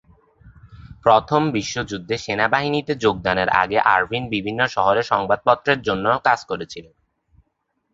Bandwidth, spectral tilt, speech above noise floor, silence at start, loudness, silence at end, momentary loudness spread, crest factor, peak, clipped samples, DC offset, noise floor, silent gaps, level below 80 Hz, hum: 7.8 kHz; -5 dB/octave; 53 dB; 0.45 s; -19 LUFS; 1.1 s; 9 LU; 20 dB; 0 dBFS; under 0.1%; under 0.1%; -72 dBFS; none; -50 dBFS; none